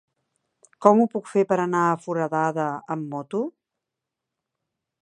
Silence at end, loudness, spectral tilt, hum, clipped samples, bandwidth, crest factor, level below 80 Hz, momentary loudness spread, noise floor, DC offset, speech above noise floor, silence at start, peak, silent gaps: 1.55 s; -23 LUFS; -7.5 dB/octave; none; under 0.1%; 11 kHz; 24 dB; -74 dBFS; 12 LU; -85 dBFS; under 0.1%; 63 dB; 0.8 s; 0 dBFS; none